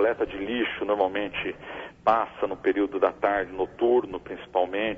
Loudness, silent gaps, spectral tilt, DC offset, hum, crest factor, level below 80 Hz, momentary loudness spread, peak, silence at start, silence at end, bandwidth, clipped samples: -26 LUFS; none; -6.5 dB/octave; under 0.1%; none; 18 dB; -56 dBFS; 9 LU; -8 dBFS; 0 s; 0 s; 6.2 kHz; under 0.1%